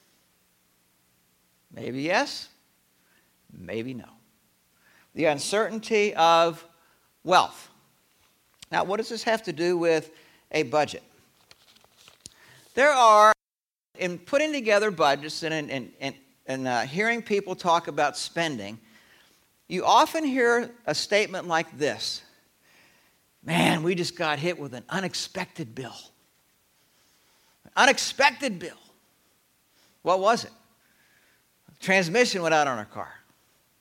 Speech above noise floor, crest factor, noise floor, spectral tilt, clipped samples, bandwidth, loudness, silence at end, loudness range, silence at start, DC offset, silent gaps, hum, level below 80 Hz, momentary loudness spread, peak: over 66 dB; 24 dB; under -90 dBFS; -3.5 dB/octave; under 0.1%; 17 kHz; -24 LUFS; 0.65 s; 10 LU; 1.75 s; under 0.1%; none; none; -70 dBFS; 17 LU; -4 dBFS